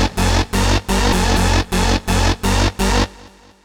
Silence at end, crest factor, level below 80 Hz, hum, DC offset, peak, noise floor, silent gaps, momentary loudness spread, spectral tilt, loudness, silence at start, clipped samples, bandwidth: 0.35 s; 16 dB; -20 dBFS; none; under 0.1%; -2 dBFS; -43 dBFS; none; 2 LU; -4.5 dB/octave; -17 LUFS; 0 s; under 0.1%; 19 kHz